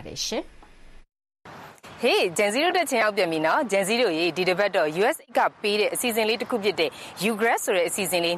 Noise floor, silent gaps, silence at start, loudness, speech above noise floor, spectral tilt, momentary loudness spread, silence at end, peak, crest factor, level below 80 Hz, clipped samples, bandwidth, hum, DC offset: -47 dBFS; none; 0 s; -23 LUFS; 23 dB; -3 dB/octave; 7 LU; 0 s; -8 dBFS; 16 dB; -58 dBFS; under 0.1%; 14.5 kHz; none; under 0.1%